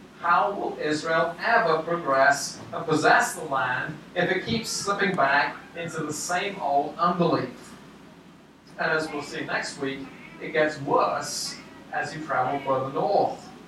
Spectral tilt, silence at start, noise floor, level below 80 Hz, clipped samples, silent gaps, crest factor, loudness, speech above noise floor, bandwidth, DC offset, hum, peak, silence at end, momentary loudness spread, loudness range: -4 dB/octave; 0 s; -50 dBFS; -64 dBFS; under 0.1%; none; 20 dB; -25 LUFS; 25 dB; 14.5 kHz; under 0.1%; none; -6 dBFS; 0 s; 11 LU; 5 LU